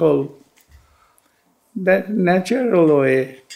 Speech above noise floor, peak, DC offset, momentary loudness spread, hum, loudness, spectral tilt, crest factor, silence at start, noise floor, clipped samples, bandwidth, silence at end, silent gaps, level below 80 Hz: 44 dB; -2 dBFS; under 0.1%; 9 LU; none; -17 LUFS; -7 dB/octave; 16 dB; 0 s; -61 dBFS; under 0.1%; 14.5 kHz; 0 s; none; -62 dBFS